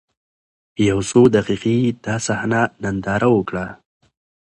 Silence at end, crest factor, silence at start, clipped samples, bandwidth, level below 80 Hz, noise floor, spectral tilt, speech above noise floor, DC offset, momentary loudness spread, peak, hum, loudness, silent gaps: 0.75 s; 18 dB; 0.8 s; under 0.1%; 11.5 kHz; -46 dBFS; under -90 dBFS; -6 dB/octave; over 73 dB; under 0.1%; 12 LU; 0 dBFS; none; -18 LUFS; none